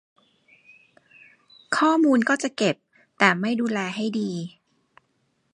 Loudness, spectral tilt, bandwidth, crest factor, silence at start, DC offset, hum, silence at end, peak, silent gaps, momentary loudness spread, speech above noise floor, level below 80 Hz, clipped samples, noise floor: -23 LUFS; -4.5 dB/octave; 11 kHz; 24 dB; 1.7 s; under 0.1%; none; 1.05 s; -2 dBFS; none; 12 LU; 48 dB; -76 dBFS; under 0.1%; -70 dBFS